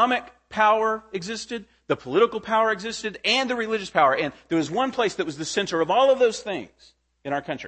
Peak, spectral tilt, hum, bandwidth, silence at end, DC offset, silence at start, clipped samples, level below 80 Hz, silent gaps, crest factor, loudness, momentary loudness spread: -4 dBFS; -3.5 dB/octave; none; 8.8 kHz; 0 s; under 0.1%; 0 s; under 0.1%; -62 dBFS; none; 20 dB; -23 LUFS; 12 LU